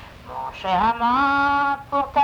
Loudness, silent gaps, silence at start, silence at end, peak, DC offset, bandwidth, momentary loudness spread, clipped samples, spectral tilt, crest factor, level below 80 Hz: -20 LUFS; none; 0 s; 0 s; -8 dBFS; under 0.1%; 19.5 kHz; 14 LU; under 0.1%; -5.5 dB/octave; 12 dB; -46 dBFS